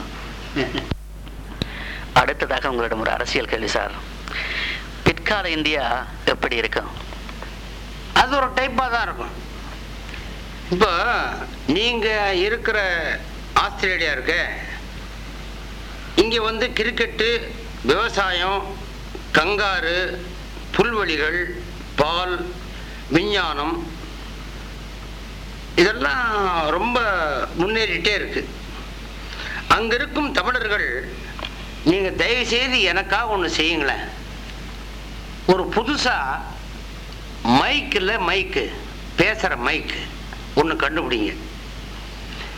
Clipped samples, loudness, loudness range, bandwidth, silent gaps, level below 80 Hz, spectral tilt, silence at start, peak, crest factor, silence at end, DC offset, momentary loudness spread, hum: under 0.1%; -21 LUFS; 3 LU; 17.5 kHz; none; -36 dBFS; -4 dB/octave; 0 s; -6 dBFS; 18 dB; 0 s; under 0.1%; 17 LU; none